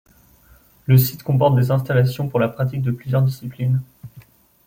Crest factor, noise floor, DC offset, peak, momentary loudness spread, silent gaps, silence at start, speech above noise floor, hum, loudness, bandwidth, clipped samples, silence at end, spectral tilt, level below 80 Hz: 16 dB; -52 dBFS; under 0.1%; -4 dBFS; 8 LU; none; 0.9 s; 34 dB; none; -19 LUFS; 16.5 kHz; under 0.1%; 0.45 s; -7.5 dB/octave; -54 dBFS